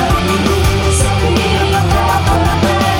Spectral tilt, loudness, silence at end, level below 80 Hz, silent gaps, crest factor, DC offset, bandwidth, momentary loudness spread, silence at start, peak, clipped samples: -5 dB/octave; -13 LUFS; 0 s; -20 dBFS; none; 12 dB; under 0.1%; 16.5 kHz; 1 LU; 0 s; 0 dBFS; under 0.1%